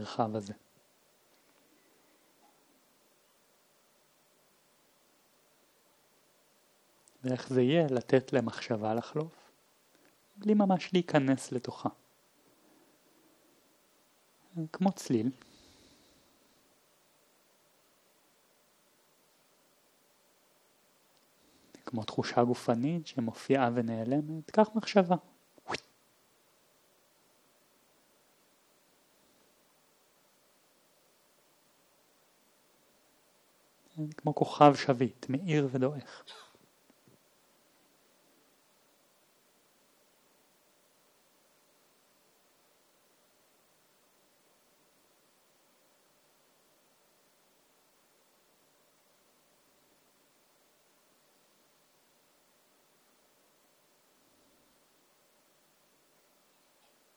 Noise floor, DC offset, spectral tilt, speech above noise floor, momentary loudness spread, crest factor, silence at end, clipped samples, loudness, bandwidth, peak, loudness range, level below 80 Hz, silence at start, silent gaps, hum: -68 dBFS; under 0.1%; -6.5 dB/octave; 38 dB; 15 LU; 30 dB; 20.75 s; under 0.1%; -31 LUFS; over 20 kHz; -6 dBFS; 15 LU; -84 dBFS; 0 s; none; none